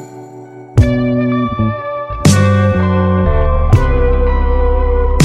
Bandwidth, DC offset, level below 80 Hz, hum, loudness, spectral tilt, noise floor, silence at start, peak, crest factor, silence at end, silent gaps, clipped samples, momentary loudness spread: 13 kHz; under 0.1%; -16 dBFS; none; -13 LUFS; -7 dB/octave; -33 dBFS; 0 s; 0 dBFS; 12 dB; 0 s; none; under 0.1%; 10 LU